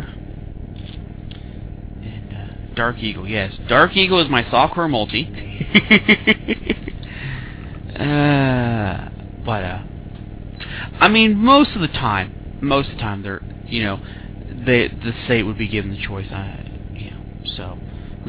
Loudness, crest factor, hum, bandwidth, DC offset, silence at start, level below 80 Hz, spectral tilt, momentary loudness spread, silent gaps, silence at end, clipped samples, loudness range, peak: -18 LUFS; 20 dB; none; 4 kHz; under 0.1%; 0 s; -36 dBFS; -9.5 dB/octave; 22 LU; none; 0 s; under 0.1%; 7 LU; 0 dBFS